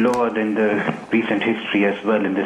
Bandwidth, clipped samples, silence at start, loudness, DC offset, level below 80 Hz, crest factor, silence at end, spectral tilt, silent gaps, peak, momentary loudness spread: 11 kHz; under 0.1%; 0 s; -20 LUFS; under 0.1%; -60 dBFS; 14 dB; 0 s; -6 dB/octave; none; -6 dBFS; 2 LU